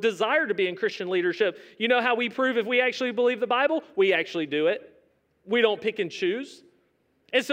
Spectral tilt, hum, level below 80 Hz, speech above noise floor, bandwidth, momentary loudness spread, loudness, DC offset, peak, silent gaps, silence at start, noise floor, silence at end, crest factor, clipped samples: -4.5 dB/octave; none; -82 dBFS; 43 dB; 15.5 kHz; 6 LU; -25 LUFS; under 0.1%; -8 dBFS; none; 0 s; -68 dBFS; 0 s; 18 dB; under 0.1%